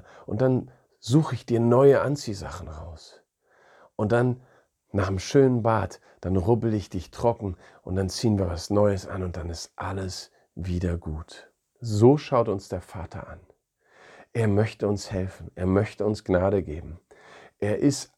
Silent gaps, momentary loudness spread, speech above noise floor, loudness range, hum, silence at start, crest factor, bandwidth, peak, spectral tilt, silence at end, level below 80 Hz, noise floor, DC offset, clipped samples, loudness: none; 18 LU; 37 dB; 4 LU; none; 0.3 s; 22 dB; 13 kHz; -4 dBFS; -7 dB/octave; 0.15 s; -48 dBFS; -62 dBFS; under 0.1%; under 0.1%; -25 LUFS